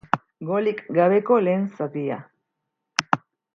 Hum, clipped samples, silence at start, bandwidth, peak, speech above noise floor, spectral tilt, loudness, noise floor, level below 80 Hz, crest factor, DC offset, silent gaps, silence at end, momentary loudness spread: none; under 0.1%; 0.15 s; 10 kHz; 0 dBFS; 59 dB; -5.5 dB/octave; -23 LUFS; -80 dBFS; -68 dBFS; 24 dB; under 0.1%; none; 0.4 s; 9 LU